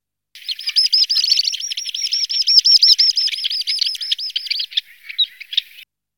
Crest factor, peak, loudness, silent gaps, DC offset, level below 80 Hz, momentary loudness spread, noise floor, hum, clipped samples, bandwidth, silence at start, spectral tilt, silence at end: 18 dB; 0 dBFS; -14 LUFS; none; 0.1%; -82 dBFS; 13 LU; -45 dBFS; none; under 0.1%; 19 kHz; 0.35 s; 8.5 dB/octave; 0.35 s